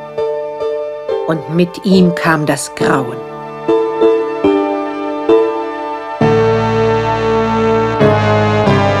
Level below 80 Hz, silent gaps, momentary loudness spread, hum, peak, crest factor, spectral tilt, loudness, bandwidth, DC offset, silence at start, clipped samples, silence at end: -40 dBFS; none; 9 LU; none; 0 dBFS; 14 dB; -6.5 dB/octave; -14 LUFS; 13.5 kHz; under 0.1%; 0 s; under 0.1%; 0 s